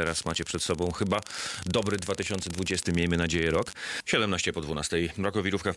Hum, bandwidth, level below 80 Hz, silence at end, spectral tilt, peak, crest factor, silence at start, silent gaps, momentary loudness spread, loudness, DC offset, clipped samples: none; 12 kHz; -52 dBFS; 0 s; -4 dB/octave; -12 dBFS; 18 dB; 0 s; none; 5 LU; -29 LUFS; under 0.1%; under 0.1%